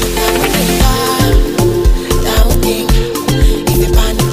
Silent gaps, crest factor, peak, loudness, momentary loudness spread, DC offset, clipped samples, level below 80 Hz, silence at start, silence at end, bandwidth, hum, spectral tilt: none; 10 dB; 0 dBFS; -12 LUFS; 2 LU; under 0.1%; under 0.1%; -14 dBFS; 0 s; 0 s; 16.5 kHz; none; -4.5 dB/octave